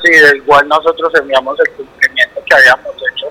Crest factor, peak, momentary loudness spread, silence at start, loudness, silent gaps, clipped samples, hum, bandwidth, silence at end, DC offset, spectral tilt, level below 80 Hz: 10 dB; 0 dBFS; 9 LU; 0 s; -9 LUFS; none; 1%; none; 17 kHz; 0 s; under 0.1%; -2.5 dB/octave; -48 dBFS